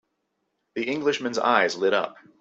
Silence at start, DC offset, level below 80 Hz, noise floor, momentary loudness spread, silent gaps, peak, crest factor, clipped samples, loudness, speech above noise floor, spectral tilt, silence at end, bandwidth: 0.75 s; under 0.1%; -72 dBFS; -76 dBFS; 12 LU; none; -4 dBFS; 22 dB; under 0.1%; -24 LUFS; 52 dB; -3.5 dB/octave; 0.3 s; 8.2 kHz